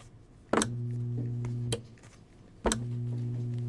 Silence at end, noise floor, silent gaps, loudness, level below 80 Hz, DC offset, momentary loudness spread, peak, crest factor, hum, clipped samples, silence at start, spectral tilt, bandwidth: 0 s; -54 dBFS; none; -33 LUFS; -50 dBFS; under 0.1%; 6 LU; -8 dBFS; 24 dB; none; under 0.1%; 0 s; -5 dB/octave; 11.5 kHz